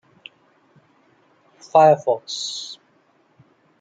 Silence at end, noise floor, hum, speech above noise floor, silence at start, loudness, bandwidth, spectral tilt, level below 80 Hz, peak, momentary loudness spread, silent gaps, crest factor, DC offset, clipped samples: 1.05 s; -60 dBFS; none; 42 dB; 1.75 s; -19 LUFS; 9.2 kHz; -4 dB/octave; -76 dBFS; -2 dBFS; 20 LU; none; 22 dB; under 0.1%; under 0.1%